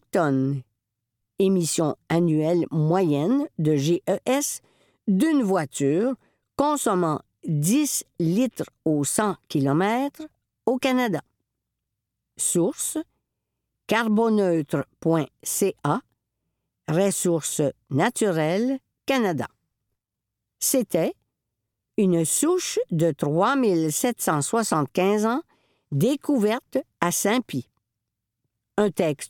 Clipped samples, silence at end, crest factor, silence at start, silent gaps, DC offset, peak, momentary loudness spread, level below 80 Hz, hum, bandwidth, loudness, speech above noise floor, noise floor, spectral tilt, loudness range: under 0.1%; 0.05 s; 22 dB; 0.15 s; none; under 0.1%; -2 dBFS; 8 LU; -66 dBFS; none; 19 kHz; -24 LUFS; 62 dB; -84 dBFS; -5 dB/octave; 4 LU